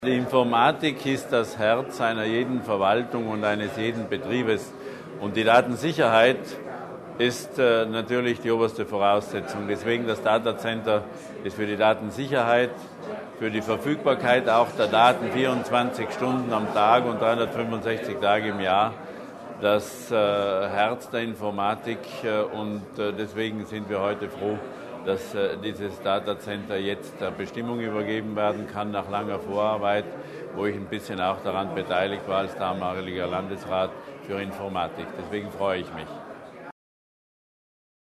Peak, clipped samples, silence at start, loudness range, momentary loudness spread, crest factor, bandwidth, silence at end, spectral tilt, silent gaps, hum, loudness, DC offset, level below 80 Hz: -4 dBFS; under 0.1%; 0 s; 7 LU; 13 LU; 20 dB; 13.5 kHz; 1.35 s; -5.5 dB/octave; none; none; -25 LUFS; under 0.1%; -64 dBFS